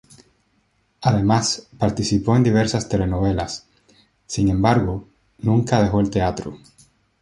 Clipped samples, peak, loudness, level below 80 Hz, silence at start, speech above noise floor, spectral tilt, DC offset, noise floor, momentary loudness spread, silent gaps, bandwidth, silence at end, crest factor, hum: under 0.1%; -2 dBFS; -20 LUFS; -38 dBFS; 1 s; 46 dB; -6 dB/octave; under 0.1%; -65 dBFS; 12 LU; none; 11.5 kHz; 0.65 s; 18 dB; none